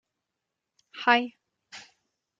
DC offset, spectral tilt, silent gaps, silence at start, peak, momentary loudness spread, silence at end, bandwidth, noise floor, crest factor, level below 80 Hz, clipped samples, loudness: under 0.1%; -2.5 dB/octave; none; 0.95 s; -6 dBFS; 24 LU; 0.6 s; 7.8 kHz; -85 dBFS; 26 dB; -88 dBFS; under 0.1%; -24 LUFS